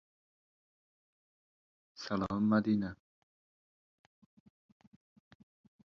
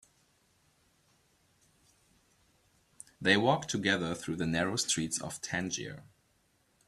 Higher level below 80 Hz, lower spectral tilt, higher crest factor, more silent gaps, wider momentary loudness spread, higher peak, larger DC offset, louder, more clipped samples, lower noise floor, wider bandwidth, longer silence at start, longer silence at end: about the same, -66 dBFS vs -66 dBFS; first, -6.5 dB/octave vs -3.5 dB/octave; about the same, 22 dB vs 24 dB; neither; about the same, 17 LU vs 17 LU; second, -18 dBFS vs -10 dBFS; neither; about the same, -33 LUFS vs -31 LUFS; neither; first, under -90 dBFS vs -72 dBFS; second, 6.8 kHz vs 14 kHz; second, 2 s vs 3.2 s; first, 2.9 s vs 0.85 s